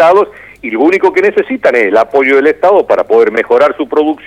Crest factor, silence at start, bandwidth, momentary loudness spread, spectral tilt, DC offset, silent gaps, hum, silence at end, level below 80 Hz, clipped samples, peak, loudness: 10 dB; 0 s; 9.8 kHz; 4 LU; -5.5 dB/octave; 0.1%; none; none; 0.1 s; -52 dBFS; 0.3%; 0 dBFS; -9 LUFS